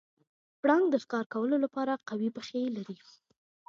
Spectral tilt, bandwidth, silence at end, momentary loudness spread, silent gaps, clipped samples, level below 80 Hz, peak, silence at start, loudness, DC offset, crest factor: -6 dB/octave; 7.4 kHz; 0.75 s; 11 LU; 1.26-1.30 s; under 0.1%; -84 dBFS; -12 dBFS; 0.65 s; -31 LUFS; under 0.1%; 20 dB